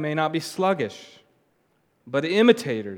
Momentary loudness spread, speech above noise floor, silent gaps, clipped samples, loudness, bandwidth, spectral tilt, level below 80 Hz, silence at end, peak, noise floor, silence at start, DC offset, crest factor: 11 LU; 44 dB; none; under 0.1%; -23 LUFS; 16.5 kHz; -5.5 dB/octave; -78 dBFS; 0 s; -2 dBFS; -67 dBFS; 0 s; under 0.1%; 22 dB